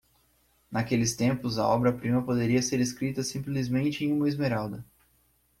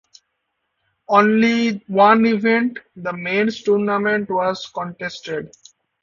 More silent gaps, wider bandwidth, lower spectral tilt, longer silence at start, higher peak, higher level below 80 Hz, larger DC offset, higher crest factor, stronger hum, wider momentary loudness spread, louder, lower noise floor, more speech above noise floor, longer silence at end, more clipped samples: neither; first, 16 kHz vs 7.4 kHz; about the same, -5.5 dB/octave vs -6 dB/octave; second, 0.7 s vs 1.1 s; second, -12 dBFS vs 0 dBFS; first, -58 dBFS vs -64 dBFS; neither; about the same, 18 dB vs 18 dB; neither; second, 7 LU vs 15 LU; second, -28 LUFS vs -18 LUFS; second, -67 dBFS vs -74 dBFS; second, 40 dB vs 56 dB; first, 0.75 s vs 0.55 s; neither